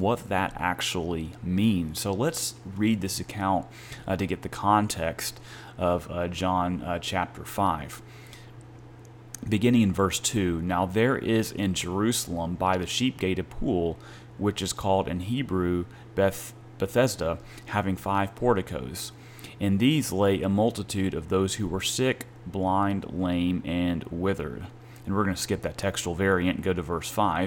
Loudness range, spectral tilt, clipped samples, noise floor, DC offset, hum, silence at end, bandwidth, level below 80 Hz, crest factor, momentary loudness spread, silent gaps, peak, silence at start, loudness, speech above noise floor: 3 LU; -5 dB/octave; under 0.1%; -47 dBFS; under 0.1%; none; 0 s; 18 kHz; -48 dBFS; 18 dB; 12 LU; none; -8 dBFS; 0 s; -27 LUFS; 20 dB